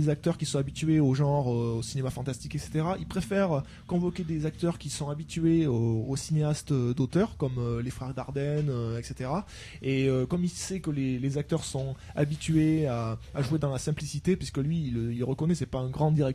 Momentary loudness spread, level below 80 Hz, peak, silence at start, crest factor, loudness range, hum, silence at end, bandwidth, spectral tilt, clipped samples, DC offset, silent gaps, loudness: 9 LU; -48 dBFS; -14 dBFS; 0 s; 16 dB; 2 LU; none; 0 s; 13.5 kHz; -6.5 dB/octave; under 0.1%; under 0.1%; none; -29 LUFS